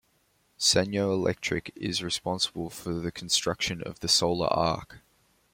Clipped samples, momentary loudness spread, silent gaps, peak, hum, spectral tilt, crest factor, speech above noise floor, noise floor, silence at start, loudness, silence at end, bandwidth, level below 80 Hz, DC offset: under 0.1%; 10 LU; none; -8 dBFS; none; -3 dB/octave; 20 dB; 41 dB; -69 dBFS; 0.6 s; -27 LUFS; 0.55 s; 16.5 kHz; -56 dBFS; under 0.1%